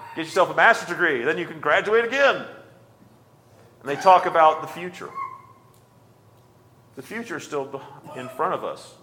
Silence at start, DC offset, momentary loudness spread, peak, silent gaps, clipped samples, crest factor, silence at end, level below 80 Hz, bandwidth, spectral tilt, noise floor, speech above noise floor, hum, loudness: 0 s; under 0.1%; 19 LU; -2 dBFS; none; under 0.1%; 22 dB; 0.15 s; -72 dBFS; 18 kHz; -4 dB/octave; -54 dBFS; 32 dB; none; -21 LUFS